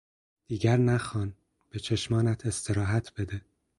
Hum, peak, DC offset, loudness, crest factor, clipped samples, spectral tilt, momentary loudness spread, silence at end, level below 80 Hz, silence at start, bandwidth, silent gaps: none; -12 dBFS; under 0.1%; -29 LUFS; 18 dB; under 0.1%; -6 dB/octave; 13 LU; 0.4 s; -50 dBFS; 0.5 s; 11.5 kHz; none